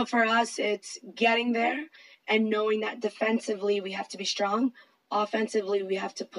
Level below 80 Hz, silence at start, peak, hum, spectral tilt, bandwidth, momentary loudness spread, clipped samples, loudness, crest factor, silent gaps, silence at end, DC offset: -90 dBFS; 0 s; -12 dBFS; none; -3.5 dB/octave; 11.5 kHz; 9 LU; under 0.1%; -28 LUFS; 16 dB; none; 0 s; under 0.1%